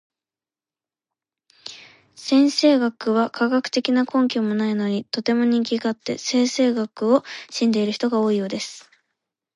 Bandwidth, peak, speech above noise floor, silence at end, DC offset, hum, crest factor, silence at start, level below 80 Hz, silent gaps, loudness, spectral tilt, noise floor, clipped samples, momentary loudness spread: 11 kHz; -4 dBFS; over 70 dB; 0.75 s; under 0.1%; none; 18 dB; 1.65 s; -74 dBFS; none; -21 LUFS; -4.5 dB/octave; under -90 dBFS; under 0.1%; 12 LU